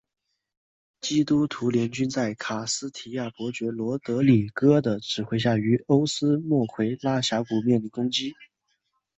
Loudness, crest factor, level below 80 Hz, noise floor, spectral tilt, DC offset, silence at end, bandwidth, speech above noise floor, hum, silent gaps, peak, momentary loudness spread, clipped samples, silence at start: -25 LUFS; 18 dB; -62 dBFS; -75 dBFS; -5.5 dB/octave; under 0.1%; 0.75 s; 8.4 kHz; 50 dB; none; none; -6 dBFS; 10 LU; under 0.1%; 1.05 s